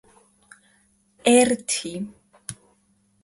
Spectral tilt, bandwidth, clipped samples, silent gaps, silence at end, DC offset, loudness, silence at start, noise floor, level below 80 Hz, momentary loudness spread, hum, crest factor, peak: -3 dB/octave; 11.5 kHz; under 0.1%; none; 0.7 s; under 0.1%; -21 LUFS; 1.25 s; -65 dBFS; -62 dBFS; 21 LU; none; 22 dB; -4 dBFS